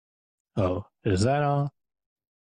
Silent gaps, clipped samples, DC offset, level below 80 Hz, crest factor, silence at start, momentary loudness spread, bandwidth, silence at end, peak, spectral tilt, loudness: none; under 0.1%; under 0.1%; -58 dBFS; 16 dB; 0.55 s; 9 LU; 10.5 kHz; 0.85 s; -12 dBFS; -7 dB/octave; -27 LUFS